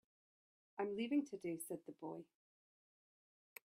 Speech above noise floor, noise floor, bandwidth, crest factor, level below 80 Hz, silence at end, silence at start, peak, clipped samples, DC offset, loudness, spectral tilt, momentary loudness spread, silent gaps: over 46 dB; under -90 dBFS; 15.5 kHz; 18 dB; under -90 dBFS; 1.4 s; 0.75 s; -28 dBFS; under 0.1%; under 0.1%; -45 LUFS; -5 dB/octave; 16 LU; none